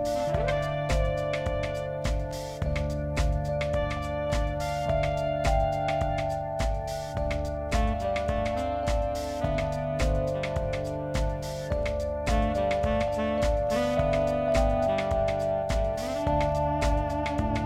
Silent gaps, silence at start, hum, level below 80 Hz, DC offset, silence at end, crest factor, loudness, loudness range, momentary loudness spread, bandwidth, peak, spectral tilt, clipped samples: none; 0 s; none; -34 dBFS; under 0.1%; 0 s; 14 dB; -28 LUFS; 3 LU; 5 LU; 15 kHz; -12 dBFS; -6 dB/octave; under 0.1%